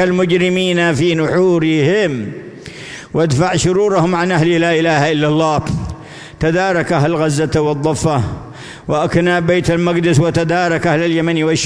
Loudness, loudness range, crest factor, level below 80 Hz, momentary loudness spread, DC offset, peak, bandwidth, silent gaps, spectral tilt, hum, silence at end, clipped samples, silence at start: -14 LUFS; 2 LU; 14 dB; -40 dBFS; 14 LU; under 0.1%; 0 dBFS; 11 kHz; none; -5.5 dB/octave; none; 0 s; under 0.1%; 0 s